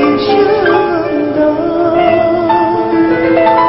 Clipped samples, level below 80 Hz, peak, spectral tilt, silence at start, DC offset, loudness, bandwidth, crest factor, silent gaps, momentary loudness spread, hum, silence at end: under 0.1%; -40 dBFS; 0 dBFS; -10.5 dB/octave; 0 s; under 0.1%; -11 LUFS; 5.8 kHz; 10 dB; none; 3 LU; none; 0 s